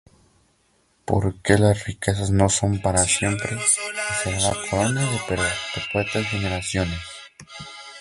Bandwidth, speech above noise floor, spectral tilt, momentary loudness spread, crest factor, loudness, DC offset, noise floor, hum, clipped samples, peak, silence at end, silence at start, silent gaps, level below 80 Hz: 11.5 kHz; 41 dB; -4 dB/octave; 18 LU; 22 dB; -22 LUFS; under 0.1%; -63 dBFS; none; under 0.1%; 0 dBFS; 0 s; 1.1 s; none; -40 dBFS